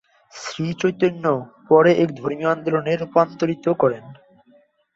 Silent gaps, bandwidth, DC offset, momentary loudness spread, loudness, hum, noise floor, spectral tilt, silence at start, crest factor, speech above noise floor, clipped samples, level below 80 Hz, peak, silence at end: none; 8 kHz; under 0.1%; 12 LU; -20 LUFS; none; -57 dBFS; -6.5 dB/octave; 0.35 s; 18 dB; 37 dB; under 0.1%; -64 dBFS; -2 dBFS; 0.8 s